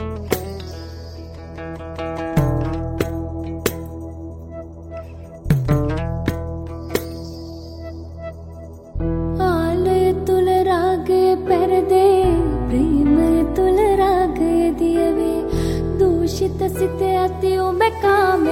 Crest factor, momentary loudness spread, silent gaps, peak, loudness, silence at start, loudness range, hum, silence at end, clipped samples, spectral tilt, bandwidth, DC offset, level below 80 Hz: 16 dB; 18 LU; none; -2 dBFS; -18 LUFS; 0 s; 9 LU; none; 0 s; under 0.1%; -7 dB/octave; 17 kHz; under 0.1%; -32 dBFS